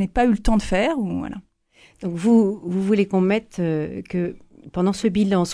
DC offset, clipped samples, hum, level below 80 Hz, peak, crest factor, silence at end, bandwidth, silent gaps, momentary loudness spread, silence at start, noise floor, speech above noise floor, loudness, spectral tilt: under 0.1%; under 0.1%; none; -36 dBFS; -4 dBFS; 16 dB; 0 s; 11 kHz; none; 12 LU; 0 s; -55 dBFS; 35 dB; -21 LUFS; -6.5 dB/octave